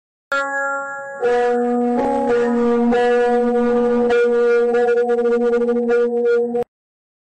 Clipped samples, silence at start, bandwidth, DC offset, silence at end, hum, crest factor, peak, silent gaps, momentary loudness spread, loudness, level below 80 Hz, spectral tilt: under 0.1%; 0.3 s; 8.6 kHz; under 0.1%; 0.75 s; none; 6 dB; -12 dBFS; none; 7 LU; -17 LUFS; -50 dBFS; -5.5 dB/octave